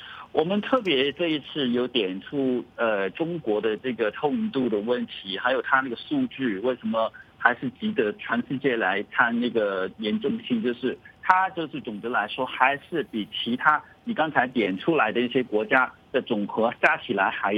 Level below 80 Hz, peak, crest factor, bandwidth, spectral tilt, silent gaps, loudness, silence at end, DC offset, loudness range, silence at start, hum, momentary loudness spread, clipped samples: -66 dBFS; -2 dBFS; 24 dB; 6.8 kHz; -7 dB/octave; none; -25 LUFS; 0 s; under 0.1%; 2 LU; 0 s; none; 7 LU; under 0.1%